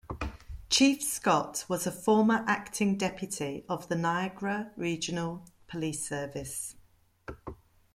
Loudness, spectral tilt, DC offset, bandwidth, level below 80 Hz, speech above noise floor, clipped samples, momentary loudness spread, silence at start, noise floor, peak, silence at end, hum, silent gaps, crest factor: -30 LUFS; -4 dB/octave; under 0.1%; 16.5 kHz; -54 dBFS; 24 dB; under 0.1%; 19 LU; 0.05 s; -54 dBFS; -12 dBFS; 0.4 s; none; none; 20 dB